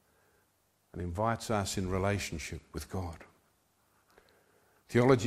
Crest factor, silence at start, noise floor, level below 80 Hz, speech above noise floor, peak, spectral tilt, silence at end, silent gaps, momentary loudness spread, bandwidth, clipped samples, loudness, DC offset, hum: 24 dB; 0.95 s; -73 dBFS; -54 dBFS; 41 dB; -10 dBFS; -5.5 dB/octave; 0 s; none; 14 LU; 15.5 kHz; under 0.1%; -34 LUFS; under 0.1%; none